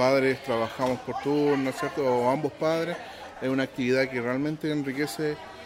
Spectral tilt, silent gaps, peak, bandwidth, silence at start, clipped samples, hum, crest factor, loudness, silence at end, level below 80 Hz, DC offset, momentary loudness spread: -6 dB/octave; none; -8 dBFS; 16 kHz; 0 s; under 0.1%; none; 18 dB; -27 LUFS; 0 s; -62 dBFS; under 0.1%; 7 LU